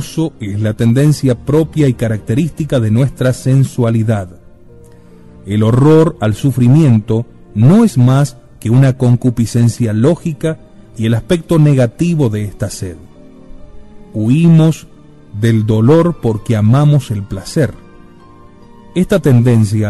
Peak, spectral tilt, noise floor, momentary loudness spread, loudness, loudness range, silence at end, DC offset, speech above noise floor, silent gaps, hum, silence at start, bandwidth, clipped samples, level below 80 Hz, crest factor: 0 dBFS; -8 dB/octave; -40 dBFS; 11 LU; -12 LUFS; 4 LU; 0 s; 0.7%; 29 dB; none; none; 0 s; 12.5 kHz; under 0.1%; -38 dBFS; 12 dB